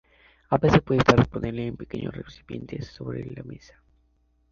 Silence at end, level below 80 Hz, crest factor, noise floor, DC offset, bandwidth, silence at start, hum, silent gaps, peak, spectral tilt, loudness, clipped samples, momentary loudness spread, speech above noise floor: 0.95 s; -44 dBFS; 24 dB; -66 dBFS; under 0.1%; 7.4 kHz; 0.5 s; none; none; -2 dBFS; -7 dB/octave; -24 LUFS; under 0.1%; 20 LU; 41 dB